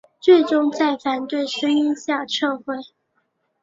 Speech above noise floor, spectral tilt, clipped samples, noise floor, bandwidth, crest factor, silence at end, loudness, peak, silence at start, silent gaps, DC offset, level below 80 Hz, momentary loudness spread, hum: 51 dB; -3 dB/octave; under 0.1%; -70 dBFS; 7.8 kHz; 18 dB; 0.8 s; -20 LUFS; -2 dBFS; 0.25 s; none; under 0.1%; -68 dBFS; 11 LU; none